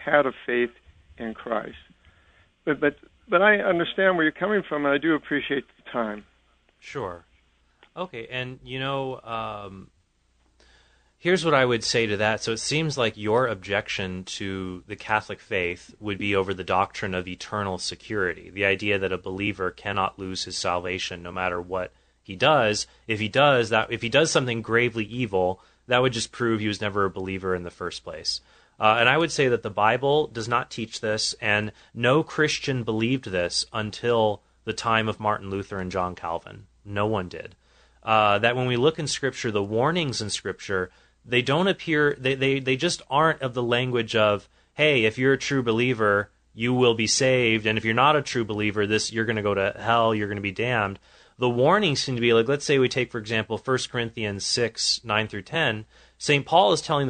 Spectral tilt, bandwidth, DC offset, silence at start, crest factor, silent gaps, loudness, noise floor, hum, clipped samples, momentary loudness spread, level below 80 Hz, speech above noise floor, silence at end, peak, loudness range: -4 dB/octave; 9.4 kHz; under 0.1%; 0 s; 22 dB; none; -24 LUFS; -66 dBFS; none; under 0.1%; 12 LU; -56 dBFS; 41 dB; 0 s; -2 dBFS; 6 LU